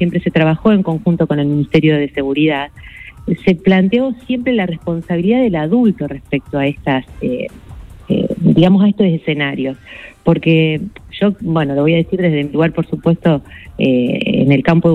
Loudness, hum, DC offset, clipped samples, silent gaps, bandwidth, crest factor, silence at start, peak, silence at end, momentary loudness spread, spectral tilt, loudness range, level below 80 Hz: -15 LUFS; none; under 0.1%; under 0.1%; none; 5.4 kHz; 14 dB; 0 s; 0 dBFS; 0 s; 10 LU; -9 dB/octave; 2 LU; -40 dBFS